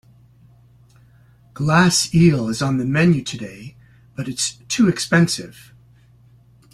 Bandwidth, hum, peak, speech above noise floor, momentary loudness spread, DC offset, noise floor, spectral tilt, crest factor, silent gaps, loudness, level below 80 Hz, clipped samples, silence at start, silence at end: 13 kHz; none; -2 dBFS; 33 dB; 17 LU; under 0.1%; -51 dBFS; -5 dB/octave; 18 dB; none; -18 LUFS; -50 dBFS; under 0.1%; 1.6 s; 1.2 s